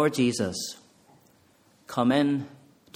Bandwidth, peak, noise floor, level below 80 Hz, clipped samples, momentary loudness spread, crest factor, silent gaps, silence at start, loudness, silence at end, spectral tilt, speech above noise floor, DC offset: 16.5 kHz; -10 dBFS; -61 dBFS; -66 dBFS; under 0.1%; 16 LU; 18 dB; none; 0 s; -27 LUFS; 0.4 s; -5 dB/octave; 36 dB; under 0.1%